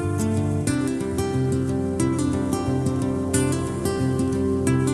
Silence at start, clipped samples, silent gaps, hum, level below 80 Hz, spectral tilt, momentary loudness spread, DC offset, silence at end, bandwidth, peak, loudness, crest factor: 0 s; under 0.1%; none; none; -42 dBFS; -6.5 dB/octave; 3 LU; under 0.1%; 0 s; 13 kHz; -8 dBFS; -23 LUFS; 14 dB